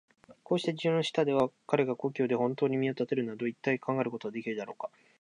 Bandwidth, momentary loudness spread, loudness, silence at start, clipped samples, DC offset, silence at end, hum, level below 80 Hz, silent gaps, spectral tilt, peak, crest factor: 10.5 kHz; 9 LU; -31 LUFS; 0.3 s; under 0.1%; under 0.1%; 0.35 s; none; -78 dBFS; none; -6.5 dB/octave; -10 dBFS; 20 dB